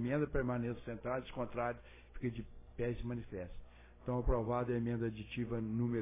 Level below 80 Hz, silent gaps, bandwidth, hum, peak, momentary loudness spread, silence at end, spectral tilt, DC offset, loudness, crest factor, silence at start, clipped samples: -50 dBFS; none; 3.8 kHz; none; -20 dBFS; 13 LU; 0 s; -7.5 dB/octave; under 0.1%; -40 LUFS; 18 dB; 0 s; under 0.1%